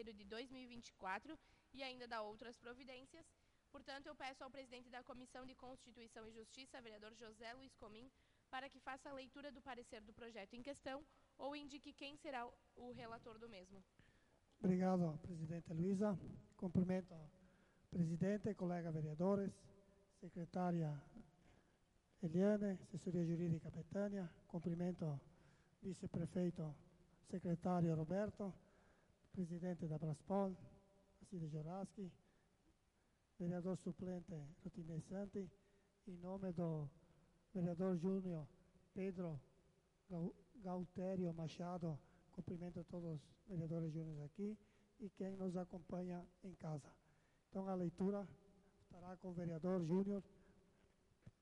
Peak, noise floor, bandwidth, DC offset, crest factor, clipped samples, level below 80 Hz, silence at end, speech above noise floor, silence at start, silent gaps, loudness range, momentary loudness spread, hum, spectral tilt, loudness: -28 dBFS; -80 dBFS; 11 kHz; under 0.1%; 20 dB; under 0.1%; -74 dBFS; 0.1 s; 34 dB; 0 s; none; 11 LU; 17 LU; none; -8 dB/octave; -47 LUFS